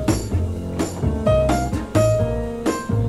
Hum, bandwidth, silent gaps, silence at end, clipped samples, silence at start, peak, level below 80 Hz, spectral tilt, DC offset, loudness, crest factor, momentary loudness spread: none; 15 kHz; none; 0 s; under 0.1%; 0 s; -4 dBFS; -30 dBFS; -6.5 dB/octave; under 0.1%; -21 LUFS; 16 dB; 6 LU